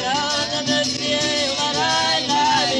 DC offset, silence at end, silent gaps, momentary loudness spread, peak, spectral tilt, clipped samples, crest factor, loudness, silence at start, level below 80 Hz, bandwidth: under 0.1%; 0 s; none; 3 LU; -6 dBFS; -2 dB/octave; under 0.1%; 14 dB; -19 LUFS; 0 s; -54 dBFS; 12 kHz